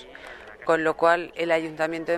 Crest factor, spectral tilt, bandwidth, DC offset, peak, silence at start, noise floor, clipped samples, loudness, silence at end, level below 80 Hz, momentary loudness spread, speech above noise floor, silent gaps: 20 dB; -5 dB/octave; 13 kHz; under 0.1%; -6 dBFS; 0 s; -43 dBFS; under 0.1%; -24 LUFS; 0 s; -60 dBFS; 20 LU; 19 dB; none